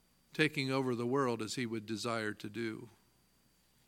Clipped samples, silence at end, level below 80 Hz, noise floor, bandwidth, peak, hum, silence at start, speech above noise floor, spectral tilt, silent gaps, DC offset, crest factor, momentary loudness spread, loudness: under 0.1%; 1 s; -78 dBFS; -71 dBFS; 17 kHz; -14 dBFS; none; 0.35 s; 35 dB; -5 dB/octave; none; under 0.1%; 24 dB; 9 LU; -36 LUFS